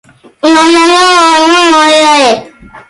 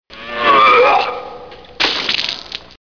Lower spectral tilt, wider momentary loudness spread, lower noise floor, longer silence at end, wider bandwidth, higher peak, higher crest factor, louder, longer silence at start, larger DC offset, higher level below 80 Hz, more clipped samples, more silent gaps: about the same, -1.5 dB/octave vs -2.5 dB/octave; second, 5 LU vs 19 LU; second, -30 dBFS vs -35 dBFS; about the same, 0.1 s vs 0.2 s; first, 11.5 kHz vs 5.4 kHz; about the same, 0 dBFS vs 0 dBFS; second, 6 dB vs 16 dB; first, -5 LUFS vs -13 LUFS; first, 0.45 s vs 0.1 s; second, under 0.1% vs 0.4%; about the same, -48 dBFS vs -50 dBFS; neither; neither